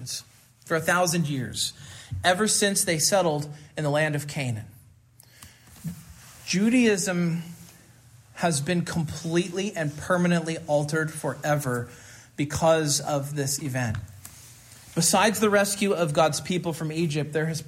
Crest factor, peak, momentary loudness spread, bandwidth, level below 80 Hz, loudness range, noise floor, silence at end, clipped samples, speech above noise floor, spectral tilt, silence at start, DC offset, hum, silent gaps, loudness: 18 dB; -8 dBFS; 15 LU; 16 kHz; -58 dBFS; 4 LU; -55 dBFS; 0 s; under 0.1%; 30 dB; -4 dB/octave; 0 s; under 0.1%; none; none; -25 LUFS